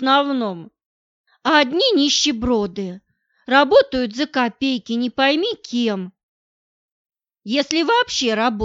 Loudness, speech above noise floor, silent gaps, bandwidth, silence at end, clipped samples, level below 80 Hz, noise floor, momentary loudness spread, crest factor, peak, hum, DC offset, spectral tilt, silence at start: -18 LUFS; over 72 dB; 0.86-1.24 s, 6.23-7.05 s; 8 kHz; 0 s; under 0.1%; -50 dBFS; under -90 dBFS; 12 LU; 18 dB; -2 dBFS; none; under 0.1%; -3 dB/octave; 0 s